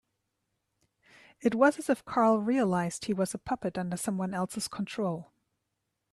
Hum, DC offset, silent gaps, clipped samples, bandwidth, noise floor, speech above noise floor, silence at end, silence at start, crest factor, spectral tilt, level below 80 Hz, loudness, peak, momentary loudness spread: none; under 0.1%; none; under 0.1%; 13 kHz; -83 dBFS; 53 dB; 0.9 s; 1.4 s; 20 dB; -5.5 dB/octave; -66 dBFS; -30 LUFS; -12 dBFS; 9 LU